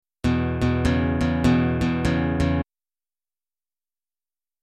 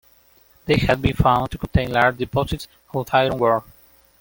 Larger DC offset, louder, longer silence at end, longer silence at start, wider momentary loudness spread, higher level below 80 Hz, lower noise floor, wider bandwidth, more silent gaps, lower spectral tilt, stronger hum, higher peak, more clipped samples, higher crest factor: neither; about the same, -22 LUFS vs -20 LUFS; first, 2 s vs 0.6 s; second, 0.25 s vs 0.65 s; second, 5 LU vs 11 LU; about the same, -34 dBFS vs -36 dBFS; first, under -90 dBFS vs -55 dBFS; second, 12 kHz vs 17 kHz; neither; about the same, -7.5 dB/octave vs -6.5 dB/octave; neither; second, -8 dBFS vs -2 dBFS; neither; about the same, 16 dB vs 20 dB